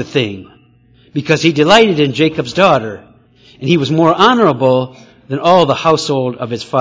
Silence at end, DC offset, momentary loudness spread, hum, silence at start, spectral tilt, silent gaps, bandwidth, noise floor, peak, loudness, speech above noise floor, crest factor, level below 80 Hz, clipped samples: 0 s; under 0.1%; 15 LU; none; 0 s; -5.5 dB/octave; none; 8 kHz; -48 dBFS; 0 dBFS; -12 LUFS; 36 dB; 14 dB; -50 dBFS; 0.3%